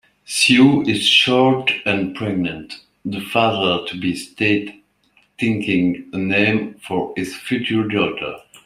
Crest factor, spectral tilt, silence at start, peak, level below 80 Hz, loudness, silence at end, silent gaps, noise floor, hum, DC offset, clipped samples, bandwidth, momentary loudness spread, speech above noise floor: 18 dB; -4.5 dB/octave; 0.3 s; -2 dBFS; -56 dBFS; -18 LUFS; 0.1 s; none; -59 dBFS; none; under 0.1%; under 0.1%; 15 kHz; 14 LU; 41 dB